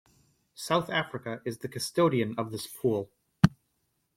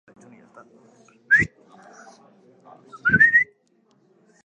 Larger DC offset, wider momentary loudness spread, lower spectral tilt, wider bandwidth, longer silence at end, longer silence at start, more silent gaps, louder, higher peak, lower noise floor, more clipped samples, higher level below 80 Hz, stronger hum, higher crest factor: neither; second, 10 LU vs 13 LU; about the same, -5.5 dB/octave vs -5.5 dB/octave; first, 16.5 kHz vs 9 kHz; second, 0.65 s vs 1 s; second, 0.6 s vs 1.3 s; neither; second, -29 LUFS vs -18 LUFS; about the same, -4 dBFS vs -6 dBFS; first, -76 dBFS vs -63 dBFS; neither; about the same, -54 dBFS vs -56 dBFS; neither; first, 28 dB vs 20 dB